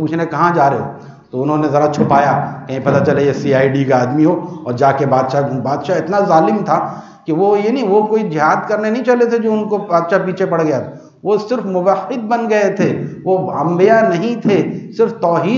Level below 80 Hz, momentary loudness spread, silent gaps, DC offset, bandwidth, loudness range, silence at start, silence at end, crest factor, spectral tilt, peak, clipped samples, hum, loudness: -60 dBFS; 8 LU; none; under 0.1%; 7.4 kHz; 2 LU; 0 s; 0 s; 14 dB; -7.5 dB/octave; 0 dBFS; under 0.1%; none; -14 LUFS